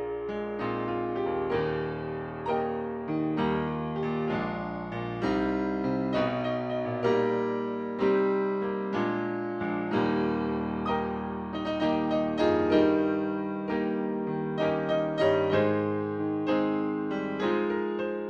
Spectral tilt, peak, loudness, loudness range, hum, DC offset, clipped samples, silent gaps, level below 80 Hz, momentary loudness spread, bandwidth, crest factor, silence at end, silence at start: -8 dB/octave; -12 dBFS; -29 LUFS; 3 LU; none; under 0.1%; under 0.1%; none; -54 dBFS; 7 LU; 7 kHz; 18 dB; 0 s; 0 s